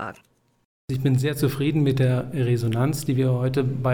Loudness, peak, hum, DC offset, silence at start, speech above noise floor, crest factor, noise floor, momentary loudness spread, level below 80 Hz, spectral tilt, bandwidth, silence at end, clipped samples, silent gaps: -23 LUFS; -10 dBFS; none; 0.5%; 0 s; 38 dB; 12 dB; -59 dBFS; 3 LU; -54 dBFS; -7 dB/octave; 17.5 kHz; 0 s; under 0.1%; 0.65-0.88 s